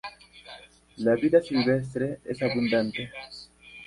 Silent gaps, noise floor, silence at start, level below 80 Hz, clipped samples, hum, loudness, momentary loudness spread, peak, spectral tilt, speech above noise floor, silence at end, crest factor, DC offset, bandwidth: none; -49 dBFS; 0.05 s; -60 dBFS; under 0.1%; none; -26 LUFS; 23 LU; -8 dBFS; -7 dB/octave; 24 dB; 0 s; 20 dB; under 0.1%; 11.5 kHz